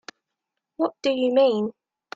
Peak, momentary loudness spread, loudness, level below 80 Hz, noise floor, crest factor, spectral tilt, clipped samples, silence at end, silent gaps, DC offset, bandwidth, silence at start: -8 dBFS; 9 LU; -23 LUFS; -72 dBFS; -83 dBFS; 16 dB; -5.5 dB/octave; under 0.1%; 0.45 s; none; under 0.1%; 7.8 kHz; 0.8 s